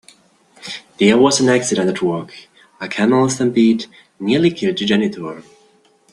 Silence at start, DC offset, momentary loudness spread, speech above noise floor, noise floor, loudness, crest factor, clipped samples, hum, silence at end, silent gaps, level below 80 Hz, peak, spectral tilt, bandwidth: 0.65 s; under 0.1%; 18 LU; 38 dB; -54 dBFS; -16 LUFS; 16 dB; under 0.1%; none; 0.7 s; none; -58 dBFS; -2 dBFS; -4.5 dB/octave; 11.5 kHz